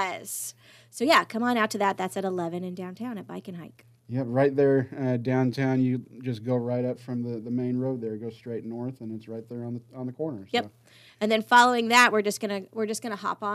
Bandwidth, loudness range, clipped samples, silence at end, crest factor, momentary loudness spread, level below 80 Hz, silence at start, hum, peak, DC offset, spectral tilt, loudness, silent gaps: 15 kHz; 9 LU; under 0.1%; 0 s; 22 dB; 18 LU; -76 dBFS; 0 s; none; -4 dBFS; under 0.1%; -5 dB/octave; -26 LUFS; none